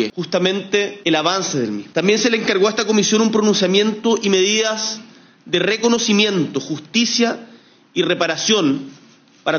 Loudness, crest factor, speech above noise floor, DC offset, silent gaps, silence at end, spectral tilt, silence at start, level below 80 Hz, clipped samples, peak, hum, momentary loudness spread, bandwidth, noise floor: -17 LUFS; 18 dB; 31 dB; under 0.1%; none; 0 s; -3.5 dB/octave; 0 s; -66 dBFS; under 0.1%; 0 dBFS; none; 8 LU; 7.2 kHz; -49 dBFS